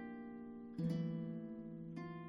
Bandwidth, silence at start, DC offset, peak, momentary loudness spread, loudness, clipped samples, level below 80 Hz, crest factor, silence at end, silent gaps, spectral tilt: 6.4 kHz; 0 s; under 0.1%; -30 dBFS; 10 LU; -46 LUFS; under 0.1%; -76 dBFS; 16 dB; 0 s; none; -9 dB/octave